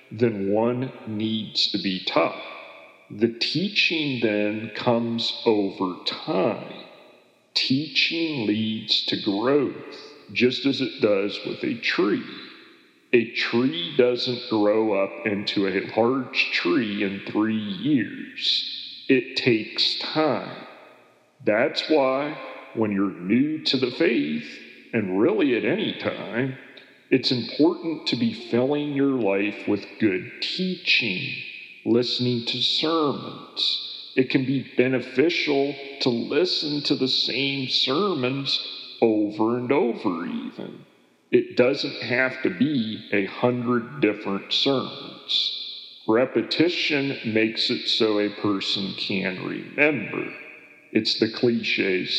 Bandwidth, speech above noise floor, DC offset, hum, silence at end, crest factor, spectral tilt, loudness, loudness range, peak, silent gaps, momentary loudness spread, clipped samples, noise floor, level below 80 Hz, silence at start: 9.8 kHz; 32 dB; under 0.1%; none; 0 s; 20 dB; -5.5 dB/octave; -23 LUFS; 2 LU; -4 dBFS; none; 9 LU; under 0.1%; -55 dBFS; -82 dBFS; 0.1 s